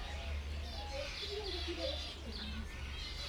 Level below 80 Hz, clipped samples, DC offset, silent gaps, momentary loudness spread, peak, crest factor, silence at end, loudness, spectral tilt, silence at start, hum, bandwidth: -46 dBFS; under 0.1%; under 0.1%; none; 5 LU; -28 dBFS; 14 dB; 0 s; -42 LUFS; -4.5 dB/octave; 0 s; none; 14.5 kHz